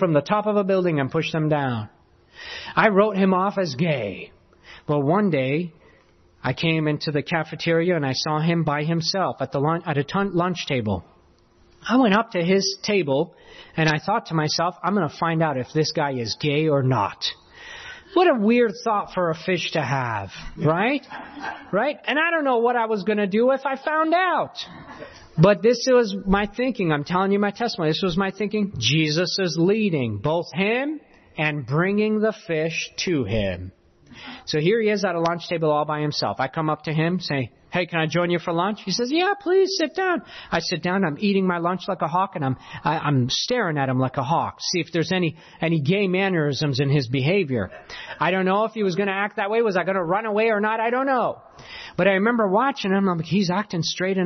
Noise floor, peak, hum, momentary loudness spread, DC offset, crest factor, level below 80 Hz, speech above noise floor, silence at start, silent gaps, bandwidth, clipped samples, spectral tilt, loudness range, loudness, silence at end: -56 dBFS; -4 dBFS; none; 9 LU; under 0.1%; 18 dB; -52 dBFS; 34 dB; 0 s; none; 6.4 kHz; under 0.1%; -5.5 dB/octave; 3 LU; -22 LUFS; 0 s